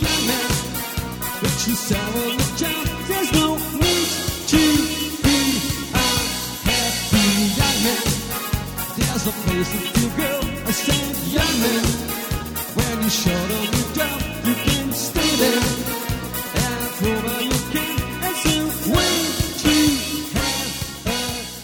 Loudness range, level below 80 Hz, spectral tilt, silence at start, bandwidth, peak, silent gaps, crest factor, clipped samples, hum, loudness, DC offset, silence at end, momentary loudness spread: 3 LU; -34 dBFS; -3.5 dB/octave; 0 s; 19 kHz; -6 dBFS; none; 16 dB; under 0.1%; none; -20 LUFS; under 0.1%; 0 s; 7 LU